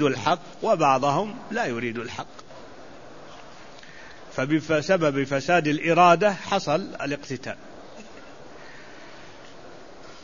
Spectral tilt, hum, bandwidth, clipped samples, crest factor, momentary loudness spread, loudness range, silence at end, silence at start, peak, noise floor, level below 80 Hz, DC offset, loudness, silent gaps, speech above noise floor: -5.5 dB/octave; none; 7.4 kHz; under 0.1%; 22 dB; 25 LU; 12 LU; 0.05 s; 0 s; -4 dBFS; -45 dBFS; -60 dBFS; 0.5%; -23 LUFS; none; 22 dB